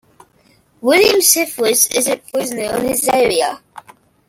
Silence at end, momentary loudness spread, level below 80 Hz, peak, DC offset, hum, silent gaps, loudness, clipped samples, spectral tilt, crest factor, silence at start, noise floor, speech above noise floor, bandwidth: 0.5 s; 11 LU; -52 dBFS; 0 dBFS; under 0.1%; none; none; -14 LUFS; under 0.1%; -1.5 dB/octave; 16 dB; 0.85 s; -54 dBFS; 39 dB; 17 kHz